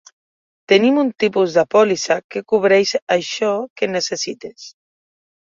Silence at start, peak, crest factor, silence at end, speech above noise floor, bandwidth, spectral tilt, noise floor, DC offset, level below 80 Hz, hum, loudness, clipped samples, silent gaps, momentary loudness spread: 0.7 s; -2 dBFS; 16 dB; 0.75 s; over 73 dB; 7.6 kHz; -4 dB/octave; under -90 dBFS; under 0.1%; -64 dBFS; none; -17 LUFS; under 0.1%; 2.24-2.29 s, 3.02-3.07 s, 3.70-3.76 s; 8 LU